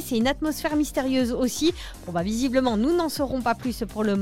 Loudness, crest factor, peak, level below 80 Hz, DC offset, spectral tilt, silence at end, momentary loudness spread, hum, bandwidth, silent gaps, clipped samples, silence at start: -25 LUFS; 16 dB; -8 dBFS; -42 dBFS; 0.3%; -4.5 dB/octave; 0 s; 6 LU; none; 17 kHz; none; under 0.1%; 0 s